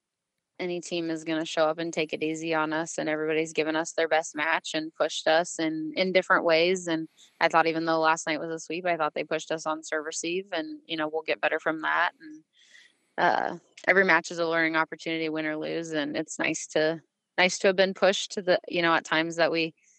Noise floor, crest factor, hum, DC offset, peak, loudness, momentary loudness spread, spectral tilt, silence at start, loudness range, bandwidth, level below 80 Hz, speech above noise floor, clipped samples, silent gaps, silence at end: -84 dBFS; 22 dB; none; under 0.1%; -6 dBFS; -27 LUFS; 9 LU; -3.5 dB/octave; 0.6 s; 4 LU; 9.2 kHz; -84 dBFS; 57 dB; under 0.1%; none; 0.3 s